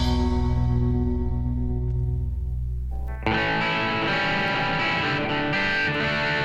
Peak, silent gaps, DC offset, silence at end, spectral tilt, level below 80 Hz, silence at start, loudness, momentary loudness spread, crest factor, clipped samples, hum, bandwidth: -8 dBFS; none; under 0.1%; 0 s; -6.5 dB/octave; -30 dBFS; 0 s; -24 LUFS; 7 LU; 16 dB; under 0.1%; none; 8 kHz